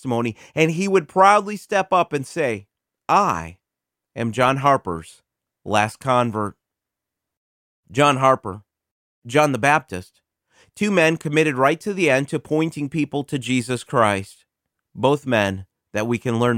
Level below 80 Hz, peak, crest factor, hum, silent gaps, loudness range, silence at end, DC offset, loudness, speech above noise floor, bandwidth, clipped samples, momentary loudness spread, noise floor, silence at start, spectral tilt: -58 dBFS; -2 dBFS; 20 dB; none; 7.37-7.83 s, 8.91-9.22 s; 3 LU; 0 s; under 0.1%; -20 LUFS; 65 dB; 16.5 kHz; under 0.1%; 14 LU; -85 dBFS; 0.05 s; -5.5 dB/octave